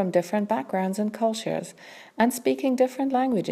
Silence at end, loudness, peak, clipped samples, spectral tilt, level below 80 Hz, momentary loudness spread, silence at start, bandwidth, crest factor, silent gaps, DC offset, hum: 0 s; -25 LUFS; -8 dBFS; under 0.1%; -5.5 dB/octave; -72 dBFS; 9 LU; 0 s; 15.5 kHz; 18 dB; none; under 0.1%; none